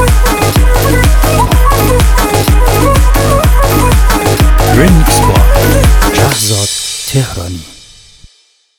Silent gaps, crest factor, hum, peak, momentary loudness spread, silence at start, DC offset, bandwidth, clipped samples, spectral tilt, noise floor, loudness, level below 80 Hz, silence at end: none; 8 dB; none; 0 dBFS; 6 LU; 0 s; 2%; 19.5 kHz; 0.4%; -4.5 dB/octave; -50 dBFS; -9 LUFS; -10 dBFS; 1 s